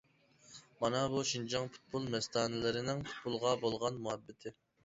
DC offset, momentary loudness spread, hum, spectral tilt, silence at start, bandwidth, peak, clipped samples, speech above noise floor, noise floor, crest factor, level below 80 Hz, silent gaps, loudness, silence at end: under 0.1%; 16 LU; none; -4 dB/octave; 0.5 s; 7.6 kHz; -18 dBFS; under 0.1%; 28 dB; -65 dBFS; 20 dB; -68 dBFS; none; -37 LUFS; 0.3 s